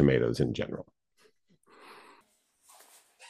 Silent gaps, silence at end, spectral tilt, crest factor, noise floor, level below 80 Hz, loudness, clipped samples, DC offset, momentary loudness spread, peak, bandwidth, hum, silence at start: none; 0.05 s; -7.5 dB/octave; 22 dB; -68 dBFS; -54 dBFS; -30 LUFS; under 0.1%; under 0.1%; 28 LU; -10 dBFS; 13.5 kHz; none; 0 s